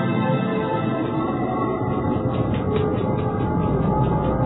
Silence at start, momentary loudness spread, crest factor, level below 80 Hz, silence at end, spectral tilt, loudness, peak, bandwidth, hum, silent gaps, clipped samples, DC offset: 0 s; 3 LU; 14 dB; -36 dBFS; 0 s; -12 dB/octave; -22 LUFS; -8 dBFS; 4.1 kHz; none; none; under 0.1%; under 0.1%